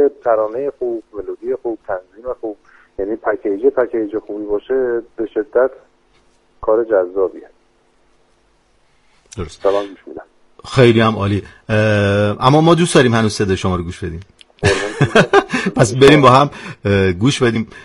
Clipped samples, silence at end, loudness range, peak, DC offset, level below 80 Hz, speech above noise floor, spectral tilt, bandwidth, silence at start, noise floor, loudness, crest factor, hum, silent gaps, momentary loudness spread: under 0.1%; 0.05 s; 9 LU; 0 dBFS; under 0.1%; -44 dBFS; 41 dB; -6 dB/octave; 11.5 kHz; 0 s; -56 dBFS; -15 LUFS; 16 dB; none; none; 16 LU